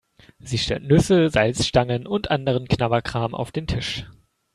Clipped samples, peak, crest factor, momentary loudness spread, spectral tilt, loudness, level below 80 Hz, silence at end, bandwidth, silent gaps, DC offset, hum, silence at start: under 0.1%; -2 dBFS; 20 dB; 10 LU; -5.5 dB/octave; -22 LUFS; -42 dBFS; 0.45 s; 13 kHz; none; under 0.1%; none; 0.45 s